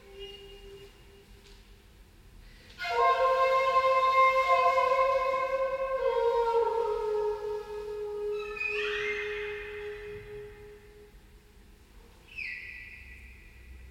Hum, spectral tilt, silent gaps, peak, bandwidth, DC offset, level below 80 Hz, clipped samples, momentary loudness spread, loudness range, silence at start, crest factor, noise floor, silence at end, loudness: none; -3 dB/octave; none; -12 dBFS; 15 kHz; under 0.1%; -54 dBFS; under 0.1%; 21 LU; 18 LU; 0.05 s; 18 dB; -55 dBFS; 0 s; -28 LUFS